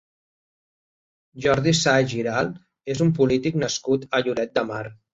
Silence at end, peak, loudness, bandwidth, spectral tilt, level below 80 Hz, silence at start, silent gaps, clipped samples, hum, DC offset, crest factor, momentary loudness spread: 0.2 s; -4 dBFS; -22 LUFS; 8.2 kHz; -5 dB/octave; -54 dBFS; 1.35 s; none; under 0.1%; none; under 0.1%; 18 dB; 11 LU